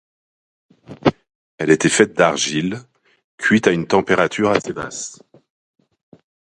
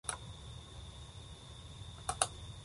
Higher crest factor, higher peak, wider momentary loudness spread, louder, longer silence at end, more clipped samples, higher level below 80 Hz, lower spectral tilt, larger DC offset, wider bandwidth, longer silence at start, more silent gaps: second, 20 dB vs 32 dB; first, 0 dBFS vs -12 dBFS; second, 12 LU vs 15 LU; first, -17 LUFS vs -43 LUFS; first, 1.35 s vs 0 s; neither; about the same, -54 dBFS vs -54 dBFS; first, -4 dB/octave vs -2 dB/octave; neither; about the same, 11.5 kHz vs 11.5 kHz; first, 0.9 s vs 0.05 s; first, 1.35-1.58 s, 3.24-3.38 s vs none